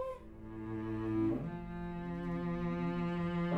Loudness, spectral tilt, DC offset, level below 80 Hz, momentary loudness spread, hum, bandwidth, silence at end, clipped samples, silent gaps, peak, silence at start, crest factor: -38 LUFS; -9.5 dB/octave; under 0.1%; -54 dBFS; 9 LU; none; 5.2 kHz; 0 s; under 0.1%; none; -24 dBFS; 0 s; 14 dB